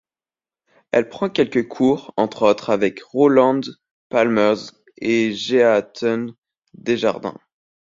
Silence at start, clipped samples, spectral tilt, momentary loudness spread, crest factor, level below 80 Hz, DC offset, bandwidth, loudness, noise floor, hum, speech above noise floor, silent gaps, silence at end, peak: 0.95 s; under 0.1%; -5.5 dB/octave; 12 LU; 18 dB; -62 dBFS; under 0.1%; 7.6 kHz; -19 LUFS; under -90 dBFS; none; over 72 dB; 3.91-4.10 s, 6.38-6.42 s; 0.65 s; -2 dBFS